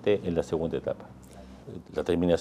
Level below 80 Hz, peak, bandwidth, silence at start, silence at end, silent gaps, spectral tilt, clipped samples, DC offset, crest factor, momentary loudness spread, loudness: -52 dBFS; -10 dBFS; 12.5 kHz; 0 s; 0 s; none; -7 dB/octave; under 0.1%; under 0.1%; 18 dB; 21 LU; -30 LUFS